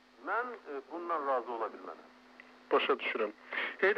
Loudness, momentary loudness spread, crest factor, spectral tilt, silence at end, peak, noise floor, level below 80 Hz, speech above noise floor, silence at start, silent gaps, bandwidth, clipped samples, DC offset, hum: -35 LUFS; 14 LU; 18 dB; -4.5 dB/octave; 0 s; -18 dBFS; -57 dBFS; -84 dBFS; 22 dB; 0.2 s; none; 7 kHz; under 0.1%; under 0.1%; none